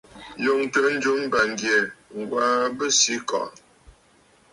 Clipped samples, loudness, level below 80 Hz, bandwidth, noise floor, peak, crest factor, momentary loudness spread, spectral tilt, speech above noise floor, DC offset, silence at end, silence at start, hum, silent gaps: under 0.1%; -22 LUFS; -62 dBFS; 11.5 kHz; -58 dBFS; -6 dBFS; 18 dB; 11 LU; -1.5 dB/octave; 35 dB; under 0.1%; 1.05 s; 0.15 s; none; none